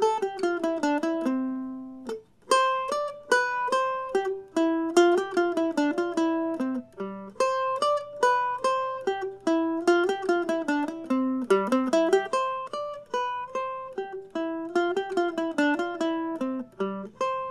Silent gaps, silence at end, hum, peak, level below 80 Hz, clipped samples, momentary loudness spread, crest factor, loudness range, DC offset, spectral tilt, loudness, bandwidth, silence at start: none; 0 s; none; -6 dBFS; -70 dBFS; under 0.1%; 10 LU; 20 dB; 4 LU; under 0.1%; -4 dB/octave; -27 LUFS; 12.5 kHz; 0 s